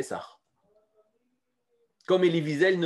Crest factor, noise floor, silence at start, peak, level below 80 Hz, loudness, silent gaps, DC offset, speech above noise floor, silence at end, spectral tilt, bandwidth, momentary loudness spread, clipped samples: 18 dB; -78 dBFS; 0 s; -10 dBFS; -80 dBFS; -25 LUFS; none; under 0.1%; 53 dB; 0 s; -6 dB/octave; 12 kHz; 16 LU; under 0.1%